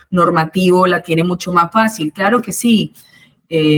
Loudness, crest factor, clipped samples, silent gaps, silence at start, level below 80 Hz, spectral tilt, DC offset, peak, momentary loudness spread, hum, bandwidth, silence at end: -14 LUFS; 14 dB; under 0.1%; none; 0.1 s; -54 dBFS; -5.5 dB/octave; under 0.1%; 0 dBFS; 5 LU; none; over 20 kHz; 0 s